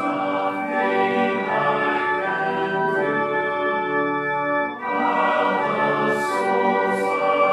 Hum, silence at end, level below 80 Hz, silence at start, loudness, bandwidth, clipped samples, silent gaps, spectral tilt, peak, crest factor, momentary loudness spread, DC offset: none; 0 s; -68 dBFS; 0 s; -21 LUFS; 14 kHz; under 0.1%; none; -5.5 dB/octave; -6 dBFS; 14 dB; 3 LU; under 0.1%